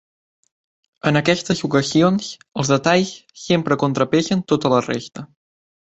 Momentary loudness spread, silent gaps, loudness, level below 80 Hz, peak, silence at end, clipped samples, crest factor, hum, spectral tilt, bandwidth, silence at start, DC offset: 11 LU; none; -19 LUFS; -56 dBFS; -2 dBFS; 0.65 s; under 0.1%; 18 dB; none; -5 dB/octave; 8.2 kHz; 1.05 s; under 0.1%